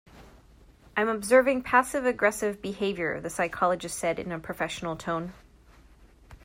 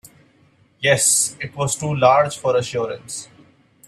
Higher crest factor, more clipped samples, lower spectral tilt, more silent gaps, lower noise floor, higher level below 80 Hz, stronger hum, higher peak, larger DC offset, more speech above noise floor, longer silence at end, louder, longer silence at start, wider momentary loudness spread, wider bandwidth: about the same, 20 dB vs 20 dB; neither; about the same, -4 dB/octave vs -3 dB/octave; neither; about the same, -55 dBFS vs -56 dBFS; about the same, -56 dBFS vs -58 dBFS; neither; second, -8 dBFS vs 0 dBFS; neither; second, 28 dB vs 37 dB; second, 0.1 s vs 0.6 s; second, -27 LUFS vs -18 LUFS; second, 0.15 s vs 0.8 s; about the same, 12 LU vs 14 LU; about the same, 16 kHz vs 15.5 kHz